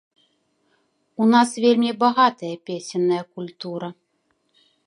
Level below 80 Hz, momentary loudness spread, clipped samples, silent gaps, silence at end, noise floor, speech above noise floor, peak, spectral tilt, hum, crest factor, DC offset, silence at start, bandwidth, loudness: -76 dBFS; 16 LU; under 0.1%; none; 0.95 s; -69 dBFS; 49 dB; -2 dBFS; -5 dB/octave; none; 20 dB; under 0.1%; 1.2 s; 11.5 kHz; -20 LUFS